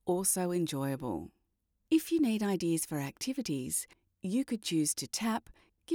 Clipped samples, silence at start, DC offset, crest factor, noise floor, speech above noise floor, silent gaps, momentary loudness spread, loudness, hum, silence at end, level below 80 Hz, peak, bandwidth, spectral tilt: under 0.1%; 0.05 s; under 0.1%; 18 dB; -79 dBFS; 46 dB; none; 9 LU; -33 LUFS; none; 0 s; -66 dBFS; -16 dBFS; over 20 kHz; -4.5 dB/octave